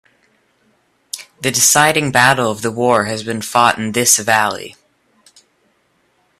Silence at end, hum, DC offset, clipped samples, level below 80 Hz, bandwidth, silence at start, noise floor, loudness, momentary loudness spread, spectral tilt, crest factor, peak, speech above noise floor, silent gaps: 1.7 s; none; under 0.1%; under 0.1%; -56 dBFS; 16 kHz; 1.15 s; -60 dBFS; -13 LUFS; 18 LU; -2 dB/octave; 18 dB; 0 dBFS; 46 dB; none